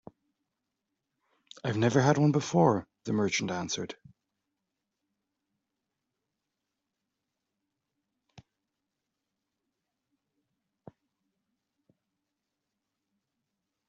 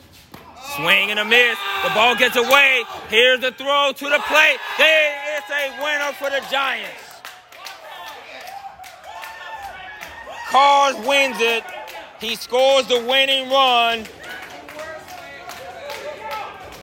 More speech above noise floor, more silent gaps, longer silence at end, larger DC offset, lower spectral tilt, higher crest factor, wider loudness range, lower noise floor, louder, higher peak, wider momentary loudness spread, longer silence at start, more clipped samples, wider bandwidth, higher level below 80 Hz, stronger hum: first, 59 dB vs 26 dB; neither; first, 9.95 s vs 0 s; neither; first, -6 dB/octave vs -1 dB/octave; first, 26 dB vs 20 dB; about the same, 13 LU vs 12 LU; first, -86 dBFS vs -43 dBFS; second, -28 LUFS vs -16 LUFS; second, -10 dBFS vs 0 dBFS; second, 12 LU vs 21 LU; first, 1.65 s vs 0.35 s; neither; second, 7.8 kHz vs 16.5 kHz; second, -72 dBFS vs -60 dBFS; neither